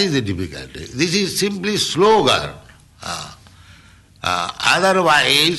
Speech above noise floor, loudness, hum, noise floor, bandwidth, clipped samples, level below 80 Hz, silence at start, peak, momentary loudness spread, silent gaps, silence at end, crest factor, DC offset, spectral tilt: 29 dB; -16 LUFS; none; -47 dBFS; 12.5 kHz; under 0.1%; -48 dBFS; 0 s; -4 dBFS; 17 LU; none; 0 s; 16 dB; under 0.1%; -3.5 dB/octave